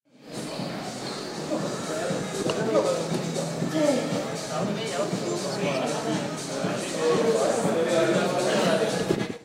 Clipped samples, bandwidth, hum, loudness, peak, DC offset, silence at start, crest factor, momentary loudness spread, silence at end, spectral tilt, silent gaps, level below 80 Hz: under 0.1%; 16 kHz; none; -26 LUFS; -10 dBFS; under 0.1%; 0.2 s; 16 dB; 10 LU; 0 s; -4.5 dB/octave; none; -64 dBFS